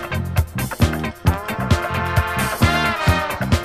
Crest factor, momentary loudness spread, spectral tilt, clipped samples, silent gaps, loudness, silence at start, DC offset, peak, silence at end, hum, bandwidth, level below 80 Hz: 18 dB; 5 LU; -5.5 dB/octave; under 0.1%; none; -20 LUFS; 0 s; under 0.1%; -2 dBFS; 0 s; none; 15.5 kHz; -28 dBFS